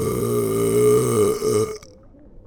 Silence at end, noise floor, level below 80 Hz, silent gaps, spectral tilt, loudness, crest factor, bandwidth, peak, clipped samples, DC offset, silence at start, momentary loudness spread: 0.05 s; -46 dBFS; -46 dBFS; none; -5.5 dB/octave; -19 LUFS; 14 dB; 19.5 kHz; -6 dBFS; under 0.1%; under 0.1%; 0 s; 8 LU